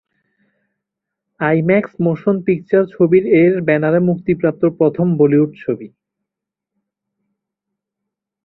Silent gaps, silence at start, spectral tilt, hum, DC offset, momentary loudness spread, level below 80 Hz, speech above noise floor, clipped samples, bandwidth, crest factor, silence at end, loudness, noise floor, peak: none; 1.4 s; -12 dB/octave; none; under 0.1%; 7 LU; -56 dBFS; 69 dB; under 0.1%; 4.1 kHz; 16 dB; 2.6 s; -15 LUFS; -83 dBFS; 0 dBFS